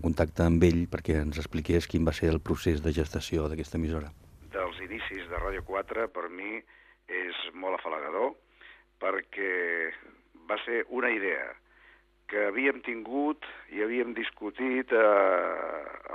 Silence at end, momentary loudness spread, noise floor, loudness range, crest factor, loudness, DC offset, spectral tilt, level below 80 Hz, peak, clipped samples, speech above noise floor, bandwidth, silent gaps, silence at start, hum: 0 s; 12 LU; -60 dBFS; 7 LU; 22 dB; -30 LUFS; under 0.1%; -6.5 dB/octave; -46 dBFS; -8 dBFS; under 0.1%; 31 dB; 14.5 kHz; none; 0 s; 50 Hz at -65 dBFS